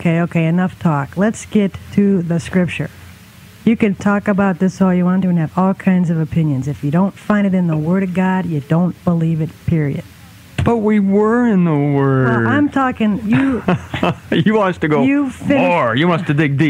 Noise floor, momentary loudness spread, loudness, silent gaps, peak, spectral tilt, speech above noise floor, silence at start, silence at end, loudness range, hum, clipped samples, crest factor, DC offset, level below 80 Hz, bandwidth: -40 dBFS; 5 LU; -16 LUFS; none; -2 dBFS; -8 dB/octave; 25 dB; 0 s; 0 s; 3 LU; none; under 0.1%; 14 dB; under 0.1%; -46 dBFS; 11 kHz